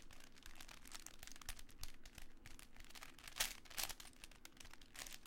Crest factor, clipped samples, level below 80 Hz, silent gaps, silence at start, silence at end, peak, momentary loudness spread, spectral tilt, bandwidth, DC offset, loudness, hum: 30 dB; under 0.1%; -60 dBFS; none; 0 s; 0 s; -22 dBFS; 17 LU; -0.5 dB/octave; 17 kHz; under 0.1%; -51 LUFS; none